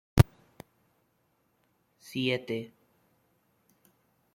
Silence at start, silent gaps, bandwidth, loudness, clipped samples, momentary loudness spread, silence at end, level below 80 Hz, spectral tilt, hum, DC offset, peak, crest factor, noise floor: 0.15 s; none; 16.5 kHz; -30 LUFS; under 0.1%; 14 LU; 1.7 s; -46 dBFS; -6.5 dB/octave; none; under 0.1%; -2 dBFS; 30 dB; -73 dBFS